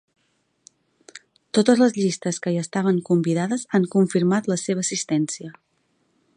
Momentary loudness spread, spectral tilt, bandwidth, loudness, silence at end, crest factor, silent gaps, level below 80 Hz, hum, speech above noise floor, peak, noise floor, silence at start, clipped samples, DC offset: 7 LU; -5.5 dB/octave; 10.5 kHz; -21 LUFS; 0.85 s; 20 dB; none; -70 dBFS; none; 48 dB; -2 dBFS; -69 dBFS; 1.15 s; under 0.1%; under 0.1%